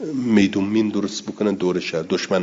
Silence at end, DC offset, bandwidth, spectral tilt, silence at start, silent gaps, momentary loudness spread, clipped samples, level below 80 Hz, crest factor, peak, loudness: 0 s; under 0.1%; 7.8 kHz; -5.5 dB/octave; 0 s; none; 7 LU; under 0.1%; -62 dBFS; 16 dB; -4 dBFS; -21 LUFS